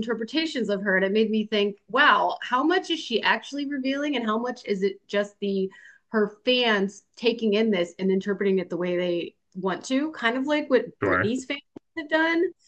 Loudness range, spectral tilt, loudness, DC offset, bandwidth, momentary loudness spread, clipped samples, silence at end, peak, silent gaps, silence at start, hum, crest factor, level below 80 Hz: 3 LU; -5 dB/octave; -25 LUFS; under 0.1%; 9 kHz; 8 LU; under 0.1%; 0.15 s; -6 dBFS; none; 0 s; none; 20 dB; -74 dBFS